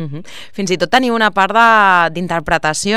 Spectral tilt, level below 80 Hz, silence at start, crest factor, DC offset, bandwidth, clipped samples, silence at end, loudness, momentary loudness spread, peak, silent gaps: -3.5 dB/octave; -44 dBFS; 0 s; 14 dB; 2%; 16 kHz; 0.1%; 0 s; -13 LUFS; 16 LU; 0 dBFS; none